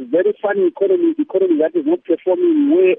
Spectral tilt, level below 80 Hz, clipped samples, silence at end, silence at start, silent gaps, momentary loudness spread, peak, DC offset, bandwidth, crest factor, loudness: -10.5 dB/octave; -76 dBFS; under 0.1%; 0 s; 0 s; none; 4 LU; -4 dBFS; under 0.1%; 3.7 kHz; 12 dB; -16 LUFS